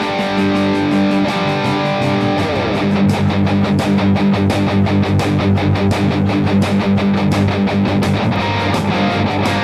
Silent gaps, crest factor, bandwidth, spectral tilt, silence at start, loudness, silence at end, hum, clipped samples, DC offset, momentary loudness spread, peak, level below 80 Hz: none; 12 dB; 13 kHz; -7 dB/octave; 0 s; -15 LUFS; 0 s; none; under 0.1%; under 0.1%; 2 LU; -2 dBFS; -40 dBFS